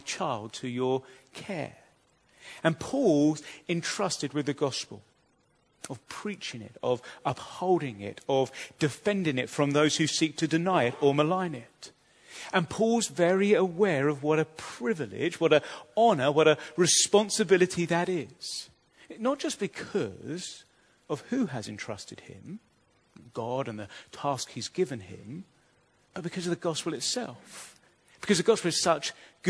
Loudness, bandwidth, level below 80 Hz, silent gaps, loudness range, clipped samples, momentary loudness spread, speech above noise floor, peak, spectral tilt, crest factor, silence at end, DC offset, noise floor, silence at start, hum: -28 LUFS; 11 kHz; -70 dBFS; none; 11 LU; under 0.1%; 19 LU; 40 dB; -8 dBFS; -4 dB/octave; 22 dB; 0 s; under 0.1%; -68 dBFS; 0.05 s; none